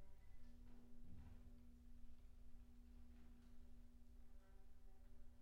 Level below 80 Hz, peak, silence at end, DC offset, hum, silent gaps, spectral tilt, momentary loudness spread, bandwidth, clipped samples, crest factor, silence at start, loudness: -62 dBFS; -46 dBFS; 0 s; under 0.1%; none; none; -7 dB/octave; 4 LU; 7.4 kHz; under 0.1%; 12 dB; 0 s; -68 LUFS